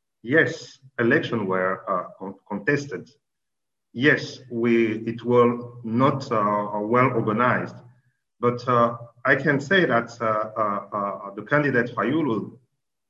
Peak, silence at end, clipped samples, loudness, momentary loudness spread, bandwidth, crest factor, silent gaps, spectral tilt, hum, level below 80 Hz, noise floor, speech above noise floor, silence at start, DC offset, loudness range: -4 dBFS; 0.55 s; under 0.1%; -23 LUFS; 12 LU; 7.8 kHz; 20 dB; none; -6.5 dB/octave; none; -64 dBFS; -86 dBFS; 64 dB; 0.25 s; under 0.1%; 4 LU